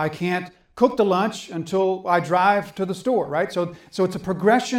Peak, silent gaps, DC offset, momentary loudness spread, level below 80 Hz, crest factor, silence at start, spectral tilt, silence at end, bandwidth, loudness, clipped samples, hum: -4 dBFS; none; under 0.1%; 9 LU; -60 dBFS; 18 dB; 0 s; -5.5 dB/octave; 0 s; 15.5 kHz; -22 LUFS; under 0.1%; none